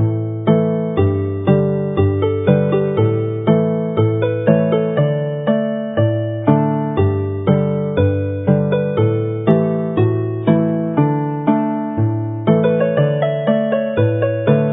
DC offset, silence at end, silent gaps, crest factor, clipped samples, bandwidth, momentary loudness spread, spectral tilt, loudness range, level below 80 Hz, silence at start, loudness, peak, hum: under 0.1%; 0 s; none; 16 dB; under 0.1%; 3.8 kHz; 3 LU; -13 dB/octave; 1 LU; -38 dBFS; 0 s; -17 LUFS; 0 dBFS; none